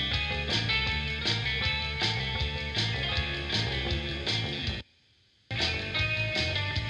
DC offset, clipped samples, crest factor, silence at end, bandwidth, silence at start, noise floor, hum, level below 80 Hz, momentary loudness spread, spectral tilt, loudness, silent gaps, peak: under 0.1%; under 0.1%; 18 dB; 0 s; 11 kHz; 0 s; -65 dBFS; none; -40 dBFS; 4 LU; -4 dB/octave; -29 LUFS; none; -14 dBFS